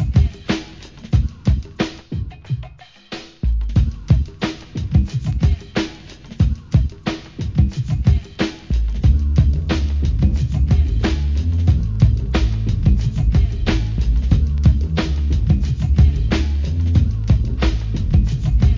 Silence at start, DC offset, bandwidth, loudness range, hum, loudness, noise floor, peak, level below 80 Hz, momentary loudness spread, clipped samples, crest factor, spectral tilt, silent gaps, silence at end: 0 s; 0.2%; 7.4 kHz; 5 LU; none; -19 LUFS; -40 dBFS; 0 dBFS; -20 dBFS; 10 LU; under 0.1%; 16 dB; -7.5 dB/octave; none; 0 s